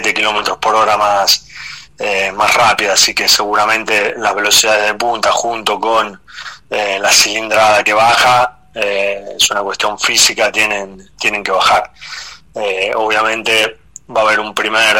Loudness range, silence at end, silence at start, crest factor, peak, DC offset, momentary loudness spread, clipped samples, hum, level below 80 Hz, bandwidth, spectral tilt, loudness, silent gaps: 4 LU; 0 s; 0 s; 14 dB; 0 dBFS; 0.5%; 12 LU; under 0.1%; none; -48 dBFS; 16.5 kHz; -0.5 dB/octave; -12 LUFS; none